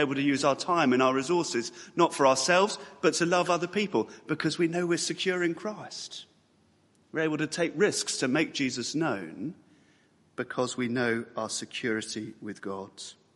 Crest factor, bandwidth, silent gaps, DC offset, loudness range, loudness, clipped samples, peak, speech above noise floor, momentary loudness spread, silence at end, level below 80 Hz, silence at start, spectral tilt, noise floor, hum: 20 dB; 11.5 kHz; none; under 0.1%; 7 LU; -28 LUFS; under 0.1%; -8 dBFS; 37 dB; 15 LU; 0.2 s; -74 dBFS; 0 s; -4 dB/octave; -65 dBFS; none